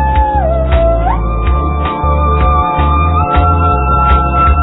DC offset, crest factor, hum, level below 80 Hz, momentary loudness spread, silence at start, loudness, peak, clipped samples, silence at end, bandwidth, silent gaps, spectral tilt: under 0.1%; 10 dB; none; -14 dBFS; 4 LU; 0 s; -11 LUFS; 0 dBFS; under 0.1%; 0 s; 4.1 kHz; none; -11.5 dB/octave